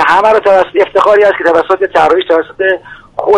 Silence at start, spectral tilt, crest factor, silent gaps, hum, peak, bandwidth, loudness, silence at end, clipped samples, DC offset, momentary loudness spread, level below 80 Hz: 0 s; -4.5 dB/octave; 8 dB; none; none; 0 dBFS; 11 kHz; -9 LUFS; 0 s; 0.3%; under 0.1%; 7 LU; -46 dBFS